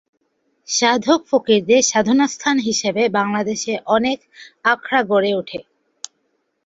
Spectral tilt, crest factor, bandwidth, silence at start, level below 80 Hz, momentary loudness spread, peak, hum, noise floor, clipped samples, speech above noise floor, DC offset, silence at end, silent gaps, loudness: -3 dB/octave; 16 dB; 8 kHz; 0.7 s; -62 dBFS; 16 LU; -2 dBFS; none; -68 dBFS; under 0.1%; 51 dB; under 0.1%; 1.05 s; none; -17 LUFS